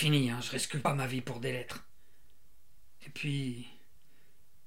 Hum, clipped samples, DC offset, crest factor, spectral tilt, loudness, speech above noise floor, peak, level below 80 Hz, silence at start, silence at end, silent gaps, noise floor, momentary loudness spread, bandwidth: none; under 0.1%; 0.5%; 22 dB; -4.5 dB/octave; -34 LUFS; 36 dB; -16 dBFS; -68 dBFS; 0 s; 0.95 s; none; -69 dBFS; 17 LU; 16 kHz